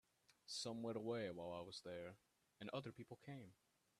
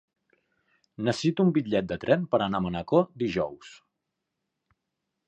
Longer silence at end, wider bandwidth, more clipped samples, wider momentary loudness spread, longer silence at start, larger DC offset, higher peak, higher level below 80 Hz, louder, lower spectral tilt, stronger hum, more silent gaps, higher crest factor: second, 0.45 s vs 1.55 s; first, 13.5 kHz vs 9 kHz; neither; first, 12 LU vs 7 LU; second, 0.5 s vs 1 s; neither; second, -32 dBFS vs -8 dBFS; second, -86 dBFS vs -58 dBFS; second, -51 LUFS vs -27 LUFS; second, -4.5 dB/octave vs -7 dB/octave; neither; neither; about the same, 20 dB vs 22 dB